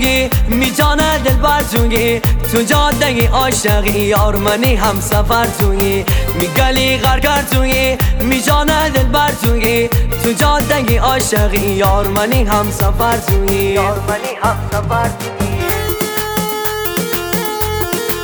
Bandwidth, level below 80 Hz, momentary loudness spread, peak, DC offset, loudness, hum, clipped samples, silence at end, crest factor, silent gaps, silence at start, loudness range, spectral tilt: over 20 kHz; -20 dBFS; 4 LU; -2 dBFS; under 0.1%; -13 LUFS; none; under 0.1%; 0 s; 10 dB; none; 0 s; 4 LU; -4.5 dB/octave